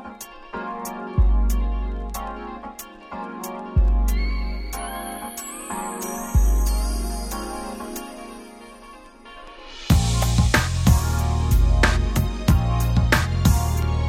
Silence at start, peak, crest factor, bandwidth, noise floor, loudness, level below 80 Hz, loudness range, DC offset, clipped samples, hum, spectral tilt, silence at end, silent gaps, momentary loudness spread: 0 s; -4 dBFS; 18 dB; 16.5 kHz; -44 dBFS; -23 LUFS; -24 dBFS; 7 LU; under 0.1%; under 0.1%; none; -5 dB/octave; 0 s; none; 19 LU